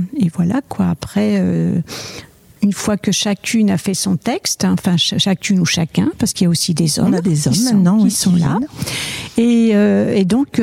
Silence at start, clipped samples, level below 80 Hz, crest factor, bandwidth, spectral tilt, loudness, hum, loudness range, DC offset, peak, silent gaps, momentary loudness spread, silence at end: 0 s; under 0.1%; -48 dBFS; 14 dB; 16 kHz; -5 dB/octave; -15 LUFS; none; 3 LU; under 0.1%; -2 dBFS; none; 7 LU; 0 s